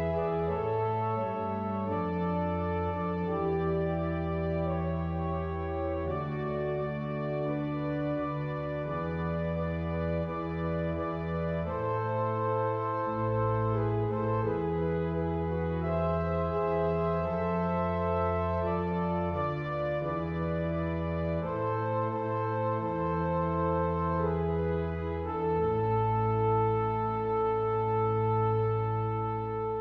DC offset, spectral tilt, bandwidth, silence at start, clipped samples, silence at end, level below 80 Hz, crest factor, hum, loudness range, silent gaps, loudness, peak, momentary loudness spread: under 0.1%; -10.5 dB/octave; 5.6 kHz; 0 s; under 0.1%; 0 s; -46 dBFS; 12 dB; none; 4 LU; none; -31 LUFS; -18 dBFS; 5 LU